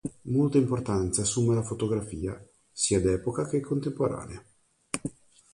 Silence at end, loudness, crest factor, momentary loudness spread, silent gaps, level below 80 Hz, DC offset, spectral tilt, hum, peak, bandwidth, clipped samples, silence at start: 0.45 s; -28 LUFS; 20 dB; 14 LU; none; -48 dBFS; under 0.1%; -5.5 dB/octave; none; -8 dBFS; 11.5 kHz; under 0.1%; 0.05 s